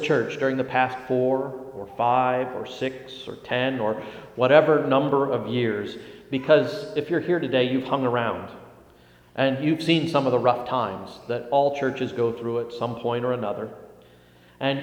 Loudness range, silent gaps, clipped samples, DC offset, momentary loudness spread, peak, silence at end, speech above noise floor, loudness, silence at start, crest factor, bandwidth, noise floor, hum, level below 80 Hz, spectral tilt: 4 LU; none; under 0.1%; under 0.1%; 14 LU; -2 dBFS; 0 s; 30 dB; -24 LUFS; 0 s; 22 dB; 16 kHz; -53 dBFS; none; -64 dBFS; -6.5 dB/octave